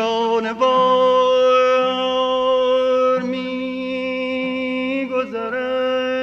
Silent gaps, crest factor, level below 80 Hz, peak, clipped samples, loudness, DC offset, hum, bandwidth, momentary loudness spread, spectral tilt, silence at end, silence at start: none; 14 dB; -60 dBFS; -4 dBFS; under 0.1%; -18 LUFS; under 0.1%; none; 7 kHz; 9 LU; -4.5 dB/octave; 0 s; 0 s